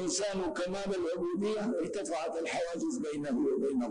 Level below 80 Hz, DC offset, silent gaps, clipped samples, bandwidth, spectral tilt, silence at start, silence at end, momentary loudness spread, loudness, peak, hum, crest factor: -62 dBFS; under 0.1%; none; under 0.1%; 10 kHz; -4 dB/octave; 0 s; 0 s; 4 LU; -34 LUFS; -22 dBFS; none; 10 dB